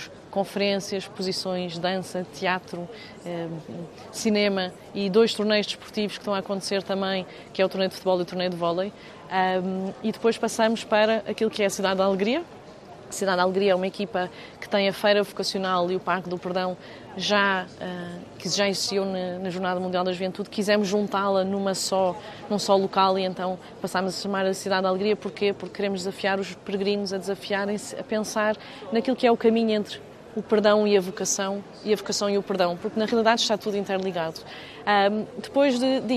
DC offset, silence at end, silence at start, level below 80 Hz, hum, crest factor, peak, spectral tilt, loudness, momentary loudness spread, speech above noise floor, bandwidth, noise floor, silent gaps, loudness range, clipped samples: under 0.1%; 0 s; 0 s; -64 dBFS; none; 20 dB; -4 dBFS; -4 dB/octave; -25 LUFS; 12 LU; 19 dB; 13.5 kHz; -44 dBFS; none; 4 LU; under 0.1%